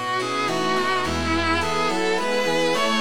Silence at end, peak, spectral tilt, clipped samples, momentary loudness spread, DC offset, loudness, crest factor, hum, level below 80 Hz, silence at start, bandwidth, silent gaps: 0 s; -10 dBFS; -3.5 dB/octave; under 0.1%; 2 LU; 2%; -22 LUFS; 12 dB; none; -42 dBFS; 0 s; 17.5 kHz; none